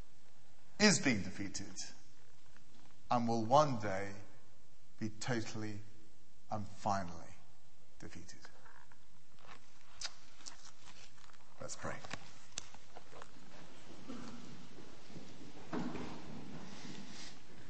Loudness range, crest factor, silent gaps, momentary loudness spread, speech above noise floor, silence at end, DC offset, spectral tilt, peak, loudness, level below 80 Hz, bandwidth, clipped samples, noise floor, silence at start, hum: 16 LU; 28 dB; none; 26 LU; 31 dB; 0 s; 1%; -4 dB/octave; -14 dBFS; -39 LUFS; -68 dBFS; 8.4 kHz; under 0.1%; -68 dBFS; 0.8 s; none